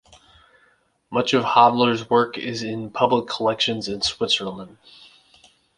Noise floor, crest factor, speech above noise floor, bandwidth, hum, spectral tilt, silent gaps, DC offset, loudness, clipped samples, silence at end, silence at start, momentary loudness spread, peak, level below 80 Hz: -62 dBFS; 20 dB; 41 dB; 11 kHz; none; -4 dB/octave; none; under 0.1%; -20 LUFS; under 0.1%; 1.1 s; 1.1 s; 13 LU; -2 dBFS; -58 dBFS